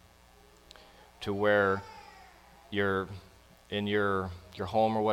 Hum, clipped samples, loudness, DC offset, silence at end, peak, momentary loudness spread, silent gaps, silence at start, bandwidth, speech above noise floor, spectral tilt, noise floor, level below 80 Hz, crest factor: none; under 0.1%; -31 LUFS; under 0.1%; 0 s; -14 dBFS; 20 LU; none; 1.2 s; 16 kHz; 29 dB; -6.5 dB/octave; -59 dBFS; -60 dBFS; 18 dB